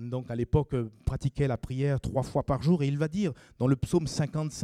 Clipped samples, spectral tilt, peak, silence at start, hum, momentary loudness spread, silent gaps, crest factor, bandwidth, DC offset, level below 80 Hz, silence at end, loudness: under 0.1%; -7.5 dB/octave; -12 dBFS; 0 s; none; 6 LU; none; 18 dB; 12 kHz; under 0.1%; -44 dBFS; 0 s; -29 LUFS